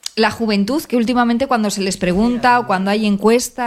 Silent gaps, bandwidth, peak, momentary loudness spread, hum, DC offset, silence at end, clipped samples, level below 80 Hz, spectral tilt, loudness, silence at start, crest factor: none; 16 kHz; 0 dBFS; 4 LU; none; under 0.1%; 0 s; under 0.1%; -44 dBFS; -4.5 dB/octave; -16 LUFS; 0.15 s; 16 dB